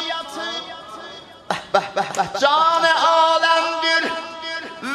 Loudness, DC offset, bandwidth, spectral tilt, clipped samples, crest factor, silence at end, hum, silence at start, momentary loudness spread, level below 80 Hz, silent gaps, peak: -19 LUFS; under 0.1%; 13.5 kHz; -2 dB/octave; under 0.1%; 18 dB; 0 s; none; 0 s; 19 LU; -62 dBFS; none; -2 dBFS